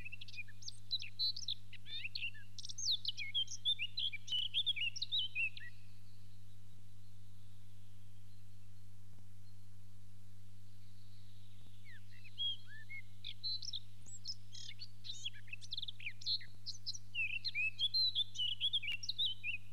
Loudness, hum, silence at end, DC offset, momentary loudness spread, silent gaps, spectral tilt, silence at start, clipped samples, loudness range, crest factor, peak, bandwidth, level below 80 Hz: -39 LUFS; 50 Hz at -60 dBFS; 0 s; 0.9%; 23 LU; none; 0 dB/octave; 0 s; under 0.1%; 24 LU; 16 dB; -26 dBFS; 13 kHz; -72 dBFS